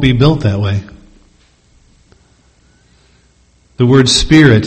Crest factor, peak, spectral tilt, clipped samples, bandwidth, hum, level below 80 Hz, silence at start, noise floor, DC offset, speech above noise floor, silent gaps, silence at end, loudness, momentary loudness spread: 14 dB; 0 dBFS; -5.5 dB/octave; 0.4%; 8.8 kHz; none; -30 dBFS; 0 s; -51 dBFS; under 0.1%; 42 dB; none; 0 s; -10 LUFS; 10 LU